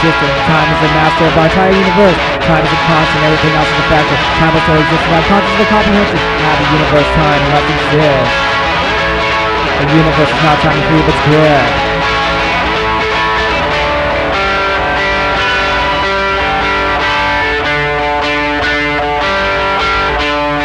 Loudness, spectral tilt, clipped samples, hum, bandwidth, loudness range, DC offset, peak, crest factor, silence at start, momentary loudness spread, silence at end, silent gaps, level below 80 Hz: -10 LUFS; -5.5 dB/octave; under 0.1%; none; 11.5 kHz; 2 LU; under 0.1%; 0 dBFS; 10 dB; 0 s; 3 LU; 0 s; none; -26 dBFS